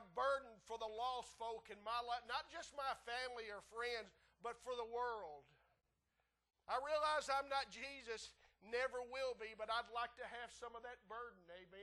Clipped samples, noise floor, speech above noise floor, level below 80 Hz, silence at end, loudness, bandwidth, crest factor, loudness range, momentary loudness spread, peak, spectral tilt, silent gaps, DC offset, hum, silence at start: under 0.1%; -87 dBFS; 40 dB; -76 dBFS; 0 s; -46 LUFS; 12 kHz; 18 dB; 5 LU; 12 LU; -28 dBFS; -1.5 dB/octave; none; under 0.1%; none; 0 s